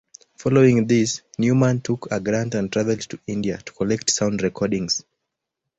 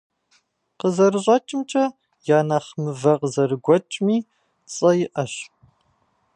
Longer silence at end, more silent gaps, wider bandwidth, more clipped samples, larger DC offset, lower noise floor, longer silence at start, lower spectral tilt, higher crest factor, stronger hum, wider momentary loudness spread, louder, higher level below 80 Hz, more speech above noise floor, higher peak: second, 0.75 s vs 0.9 s; neither; second, 8.2 kHz vs 10.5 kHz; neither; neither; first, -82 dBFS vs -66 dBFS; second, 0.4 s vs 0.85 s; about the same, -5 dB/octave vs -6 dB/octave; about the same, 18 dB vs 18 dB; neither; about the same, 10 LU vs 11 LU; about the same, -21 LUFS vs -21 LUFS; first, -54 dBFS vs -70 dBFS; first, 61 dB vs 46 dB; about the same, -4 dBFS vs -2 dBFS